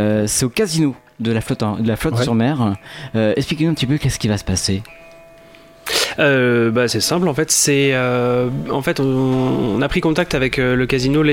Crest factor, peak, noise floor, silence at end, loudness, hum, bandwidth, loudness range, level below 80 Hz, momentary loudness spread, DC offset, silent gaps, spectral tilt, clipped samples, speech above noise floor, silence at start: 16 dB; -2 dBFS; -44 dBFS; 0 s; -17 LUFS; none; 16.5 kHz; 4 LU; -40 dBFS; 7 LU; under 0.1%; none; -4.5 dB/octave; under 0.1%; 27 dB; 0 s